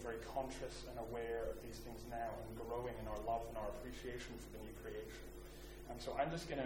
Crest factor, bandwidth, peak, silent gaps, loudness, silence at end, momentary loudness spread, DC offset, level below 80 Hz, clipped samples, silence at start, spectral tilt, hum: 20 dB; 17 kHz; -26 dBFS; none; -47 LUFS; 0 s; 11 LU; under 0.1%; -56 dBFS; under 0.1%; 0 s; -5 dB/octave; none